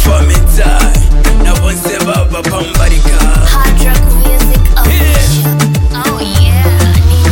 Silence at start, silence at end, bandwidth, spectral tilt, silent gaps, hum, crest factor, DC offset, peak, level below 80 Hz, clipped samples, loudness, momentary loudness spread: 0 s; 0 s; 17.5 kHz; -5 dB/octave; none; none; 6 dB; under 0.1%; 0 dBFS; -8 dBFS; under 0.1%; -10 LUFS; 4 LU